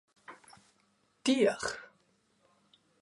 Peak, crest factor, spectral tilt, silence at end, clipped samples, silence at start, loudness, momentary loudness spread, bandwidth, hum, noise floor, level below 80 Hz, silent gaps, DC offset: -14 dBFS; 22 dB; -3.5 dB/octave; 1.15 s; under 0.1%; 0.3 s; -31 LUFS; 26 LU; 11.5 kHz; none; -72 dBFS; -72 dBFS; none; under 0.1%